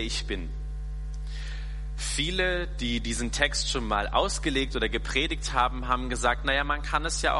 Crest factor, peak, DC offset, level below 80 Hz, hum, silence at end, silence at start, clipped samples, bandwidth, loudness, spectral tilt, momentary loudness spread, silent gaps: 20 dB; -8 dBFS; under 0.1%; -34 dBFS; none; 0 s; 0 s; under 0.1%; 11.5 kHz; -28 LUFS; -3 dB/octave; 12 LU; none